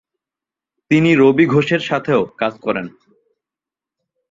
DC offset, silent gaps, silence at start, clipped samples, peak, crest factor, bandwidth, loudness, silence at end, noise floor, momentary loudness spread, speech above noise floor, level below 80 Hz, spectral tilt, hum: under 0.1%; none; 0.9 s; under 0.1%; -2 dBFS; 16 dB; 7.6 kHz; -16 LUFS; 1.45 s; -88 dBFS; 11 LU; 73 dB; -58 dBFS; -7 dB/octave; none